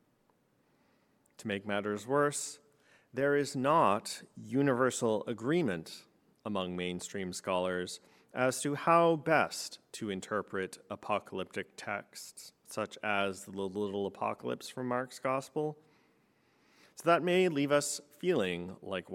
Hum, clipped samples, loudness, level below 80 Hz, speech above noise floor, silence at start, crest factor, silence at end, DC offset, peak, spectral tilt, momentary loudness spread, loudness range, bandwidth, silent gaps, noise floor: none; under 0.1%; -33 LUFS; -78 dBFS; 39 dB; 1.4 s; 22 dB; 0 s; under 0.1%; -12 dBFS; -4.5 dB/octave; 15 LU; 6 LU; 17 kHz; none; -72 dBFS